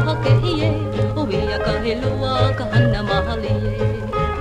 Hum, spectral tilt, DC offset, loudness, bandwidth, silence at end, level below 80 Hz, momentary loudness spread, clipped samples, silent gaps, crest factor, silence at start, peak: none; -7.5 dB/octave; under 0.1%; -20 LUFS; 9.4 kHz; 0 s; -30 dBFS; 5 LU; under 0.1%; none; 14 dB; 0 s; -4 dBFS